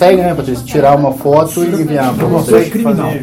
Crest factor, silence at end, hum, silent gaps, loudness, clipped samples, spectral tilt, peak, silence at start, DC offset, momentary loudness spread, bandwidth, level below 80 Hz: 10 dB; 0 s; none; none; -11 LUFS; 1%; -6.5 dB/octave; 0 dBFS; 0 s; under 0.1%; 5 LU; 17 kHz; -38 dBFS